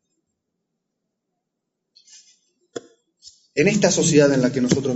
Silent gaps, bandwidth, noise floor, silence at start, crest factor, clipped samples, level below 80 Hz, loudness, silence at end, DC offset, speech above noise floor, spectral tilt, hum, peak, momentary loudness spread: none; 8 kHz; -80 dBFS; 2.75 s; 20 dB; under 0.1%; -58 dBFS; -18 LUFS; 0 s; under 0.1%; 63 dB; -4.5 dB/octave; none; -4 dBFS; 23 LU